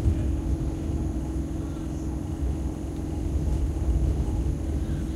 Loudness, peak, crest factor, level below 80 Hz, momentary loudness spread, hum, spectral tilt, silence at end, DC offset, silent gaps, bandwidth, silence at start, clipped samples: -29 LUFS; -12 dBFS; 16 dB; -30 dBFS; 6 LU; none; -8 dB/octave; 0 s; under 0.1%; none; 12 kHz; 0 s; under 0.1%